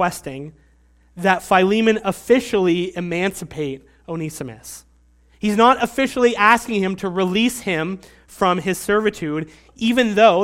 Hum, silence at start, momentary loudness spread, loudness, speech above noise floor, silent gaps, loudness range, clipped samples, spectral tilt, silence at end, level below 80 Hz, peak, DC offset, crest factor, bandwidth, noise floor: none; 0 s; 18 LU; -19 LUFS; 36 dB; none; 4 LU; under 0.1%; -5 dB/octave; 0 s; -50 dBFS; 0 dBFS; under 0.1%; 20 dB; 16.5 kHz; -54 dBFS